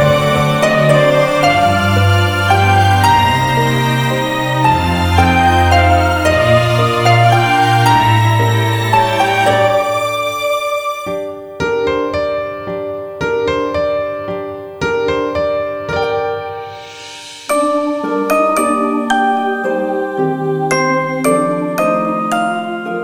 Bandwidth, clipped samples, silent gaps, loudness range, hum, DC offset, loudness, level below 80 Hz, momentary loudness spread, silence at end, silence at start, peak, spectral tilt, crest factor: over 20 kHz; under 0.1%; none; 7 LU; none; under 0.1%; -14 LUFS; -36 dBFS; 11 LU; 0 s; 0 s; 0 dBFS; -5.5 dB/octave; 14 dB